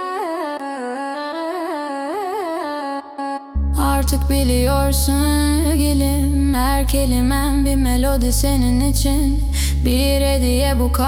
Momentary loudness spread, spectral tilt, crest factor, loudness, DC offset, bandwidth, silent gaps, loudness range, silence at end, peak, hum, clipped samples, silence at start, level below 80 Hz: 8 LU; -5.5 dB/octave; 12 dB; -19 LUFS; under 0.1%; 17.5 kHz; none; 7 LU; 0 s; -4 dBFS; none; under 0.1%; 0 s; -20 dBFS